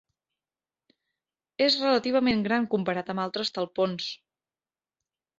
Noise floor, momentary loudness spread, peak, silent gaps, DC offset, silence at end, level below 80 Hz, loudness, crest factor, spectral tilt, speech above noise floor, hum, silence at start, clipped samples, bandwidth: under -90 dBFS; 11 LU; -8 dBFS; none; under 0.1%; 1.25 s; -66 dBFS; -26 LUFS; 22 dB; -5 dB/octave; over 64 dB; none; 1.6 s; under 0.1%; 7.8 kHz